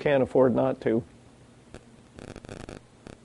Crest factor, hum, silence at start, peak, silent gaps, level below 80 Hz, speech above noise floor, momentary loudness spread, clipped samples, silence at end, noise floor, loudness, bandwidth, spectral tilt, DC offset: 20 dB; none; 0 s; -8 dBFS; none; -56 dBFS; 30 dB; 23 LU; under 0.1%; 0.5 s; -53 dBFS; -24 LUFS; 11.5 kHz; -7.5 dB/octave; under 0.1%